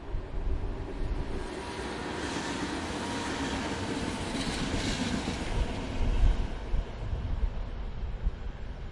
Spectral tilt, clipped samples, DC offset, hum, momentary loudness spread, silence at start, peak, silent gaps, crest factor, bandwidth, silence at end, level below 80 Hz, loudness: -5 dB/octave; under 0.1%; under 0.1%; none; 7 LU; 0 s; -12 dBFS; none; 18 dB; 11.5 kHz; 0 s; -34 dBFS; -34 LUFS